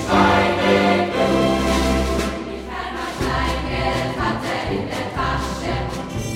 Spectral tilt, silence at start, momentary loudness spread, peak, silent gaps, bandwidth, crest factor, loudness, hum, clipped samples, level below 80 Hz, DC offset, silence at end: -5.5 dB/octave; 0 s; 11 LU; -2 dBFS; none; 16.5 kHz; 18 dB; -20 LUFS; none; under 0.1%; -32 dBFS; under 0.1%; 0 s